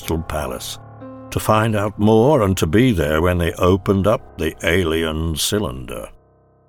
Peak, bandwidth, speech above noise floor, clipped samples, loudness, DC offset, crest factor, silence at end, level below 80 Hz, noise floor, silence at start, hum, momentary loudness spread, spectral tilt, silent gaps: -4 dBFS; 19 kHz; 37 dB; under 0.1%; -18 LUFS; under 0.1%; 14 dB; 0.6 s; -34 dBFS; -54 dBFS; 0 s; none; 15 LU; -5.5 dB/octave; none